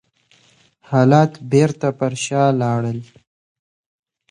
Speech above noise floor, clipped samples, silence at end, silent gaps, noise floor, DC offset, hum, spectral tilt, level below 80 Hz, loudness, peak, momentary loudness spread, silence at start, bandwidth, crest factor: 40 dB; under 0.1%; 1.25 s; none; -56 dBFS; under 0.1%; none; -6.5 dB/octave; -60 dBFS; -17 LUFS; 0 dBFS; 9 LU; 0.9 s; 11 kHz; 18 dB